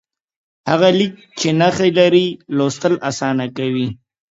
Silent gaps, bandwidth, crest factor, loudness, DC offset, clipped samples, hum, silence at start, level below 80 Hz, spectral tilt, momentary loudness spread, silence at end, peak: none; 8 kHz; 16 dB; -16 LUFS; under 0.1%; under 0.1%; none; 0.65 s; -56 dBFS; -5.5 dB/octave; 9 LU; 0.35 s; 0 dBFS